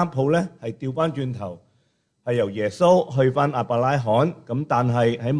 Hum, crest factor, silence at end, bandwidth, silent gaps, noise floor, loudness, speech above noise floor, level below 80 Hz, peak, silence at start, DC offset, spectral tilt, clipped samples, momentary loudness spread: none; 16 dB; 0 s; 10.5 kHz; none; -67 dBFS; -22 LUFS; 46 dB; -60 dBFS; -6 dBFS; 0 s; under 0.1%; -7.5 dB/octave; under 0.1%; 12 LU